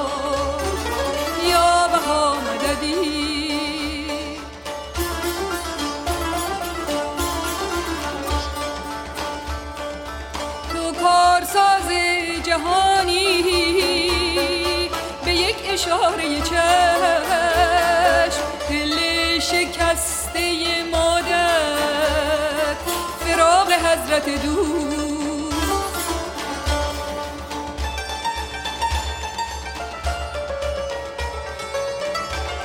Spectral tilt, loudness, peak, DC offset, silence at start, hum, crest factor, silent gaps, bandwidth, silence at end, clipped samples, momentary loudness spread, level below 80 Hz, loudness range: -3 dB/octave; -20 LUFS; -4 dBFS; under 0.1%; 0 s; none; 18 dB; none; 18 kHz; 0 s; under 0.1%; 12 LU; -34 dBFS; 8 LU